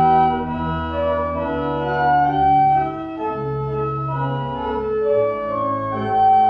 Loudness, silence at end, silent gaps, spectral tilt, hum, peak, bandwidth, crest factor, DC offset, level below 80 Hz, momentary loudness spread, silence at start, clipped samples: -20 LUFS; 0 s; none; -9 dB/octave; none; -6 dBFS; 5 kHz; 14 dB; under 0.1%; -42 dBFS; 9 LU; 0 s; under 0.1%